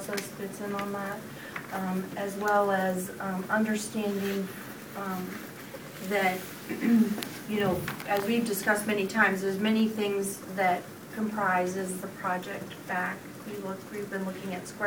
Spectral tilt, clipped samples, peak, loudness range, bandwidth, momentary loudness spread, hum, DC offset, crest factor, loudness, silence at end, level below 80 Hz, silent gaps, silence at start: -5 dB/octave; under 0.1%; -8 dBFS; 5 LU; 20 kHz; 13 LU; none; under 0.1%; 22 dB; -30 LUFS; 0 s; -66 dBFS; none; 0 s